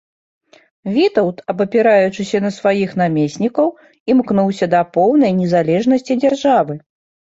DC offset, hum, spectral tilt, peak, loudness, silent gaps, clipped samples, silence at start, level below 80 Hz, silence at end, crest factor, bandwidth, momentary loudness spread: under 0.1%; none; -7 dB/octave; -2 dBFS; -15 LUFS; 4.00-4.06 s; under 0.1%; 0.85 s; -58 dBFS; 0.6 s; 14 dB; 8 kHz; 7 LU